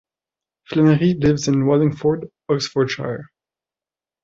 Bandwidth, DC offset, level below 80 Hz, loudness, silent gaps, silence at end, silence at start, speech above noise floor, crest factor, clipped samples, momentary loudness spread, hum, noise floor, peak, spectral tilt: 8 kHz; under 0.1%; -50 dBFS; -19 LUFS; none; 1 s; 0.7 s; over 72 dB; 16 dB; under 0.1%; 11 LU; none; under -90 dBFS; -4 dBFS; -6.5 dB/octave